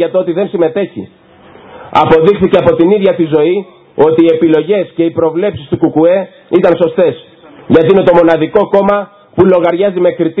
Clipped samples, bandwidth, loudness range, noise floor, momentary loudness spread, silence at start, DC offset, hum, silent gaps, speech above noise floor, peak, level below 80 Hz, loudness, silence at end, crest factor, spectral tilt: 0.6%; 5.2 kHz; 2 LU; -37 dBFS; 8 LU; 0 s; under 0.1%; none; none; 28 dB; 0 dBFS; -44 dBFS; -10 LUFS; 0 s; 10 dB; -9 dB/octave